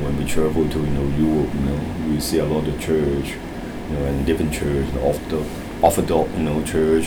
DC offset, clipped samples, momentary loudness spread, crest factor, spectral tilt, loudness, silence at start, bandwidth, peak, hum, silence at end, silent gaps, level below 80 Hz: under 0.1%; under 0.1%; 7 LU; 18 dB; -6 dB/octave; -21 LUFS; 0 s; over 20 kHz; -2 dBFS; none; 0 s; none; -32 dBFS